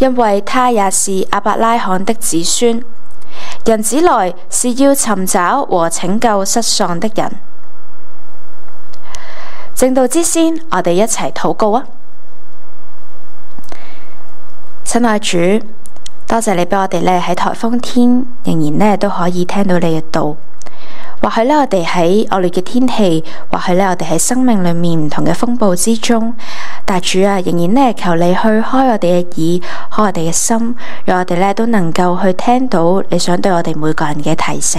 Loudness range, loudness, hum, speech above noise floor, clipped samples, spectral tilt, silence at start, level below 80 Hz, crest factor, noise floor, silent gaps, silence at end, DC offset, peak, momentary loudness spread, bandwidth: 5 LU; -13 LUFS; none; 30 dB; under 0.1%; -4.5 dB/octave; 0 s; -40 dBFS; 14 dB; -42 dBFS; none; 0 s; 30%; 0 dBFS; 8 LU; 16 kHz